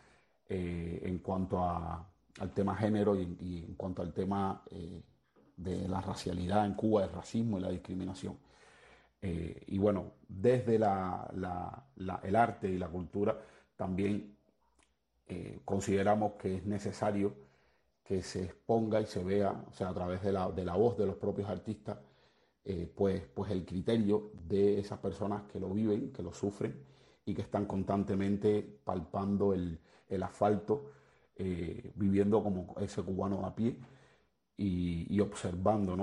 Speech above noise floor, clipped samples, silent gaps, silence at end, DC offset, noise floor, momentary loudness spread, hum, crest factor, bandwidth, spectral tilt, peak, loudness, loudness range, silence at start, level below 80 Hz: 39 dB; under 0.1%; none; 0 s; under 0.1%; -74 dBFS; 12 LU; none; 20 dB; 11.5 kHz; -7.5 dB/octave; -14 dBFS; -35 LUFS; 3 LU; 0.5 s; -60 dBFS